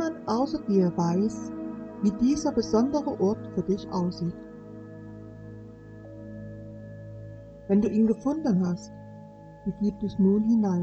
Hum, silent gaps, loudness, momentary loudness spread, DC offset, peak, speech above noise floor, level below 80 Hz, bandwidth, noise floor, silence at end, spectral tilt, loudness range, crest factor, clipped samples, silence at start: none; none; -26 LUFS; 20 LU; under 0.1%; -10 dBFS; 21 dB; -54 dBFS; 8.2 kHz; -46 dBFS; 0 s; -7.5 dB/octave; 11 LU; 16 dB; under 0.1%; 0 s